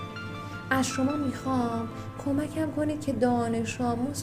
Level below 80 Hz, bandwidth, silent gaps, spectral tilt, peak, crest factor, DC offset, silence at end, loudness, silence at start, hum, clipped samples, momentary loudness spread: -56 dBFS; 15.5 kHz; none; -5.5 dB/octave; -10 dBFS; 18 dB; under 0.1%; 0 s; -29 LUFS; 0 s; none; under 0.1%; 11 LU